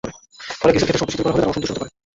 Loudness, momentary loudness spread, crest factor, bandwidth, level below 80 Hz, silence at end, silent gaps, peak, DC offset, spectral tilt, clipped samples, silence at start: -19 LUFS; 16 LU; 18 dB; 8 kHz; -44 dBFS; 0.25 s; none; -2 dBFS; under 0.1%; -5 dB/octave; under 0.1%; 0.05 s